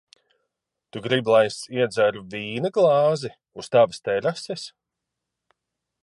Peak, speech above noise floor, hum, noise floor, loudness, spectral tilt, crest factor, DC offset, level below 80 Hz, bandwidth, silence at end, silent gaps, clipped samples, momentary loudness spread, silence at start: -6 dBFS; 61 dB; none; -83 dBFS; -22 LUFS; -5 dB/octave; 18 dB; under 0.1%; -68 dBFS; 11.5 kHz; 1.35 s; none; under 0.1%; 16 LU; 0.95 s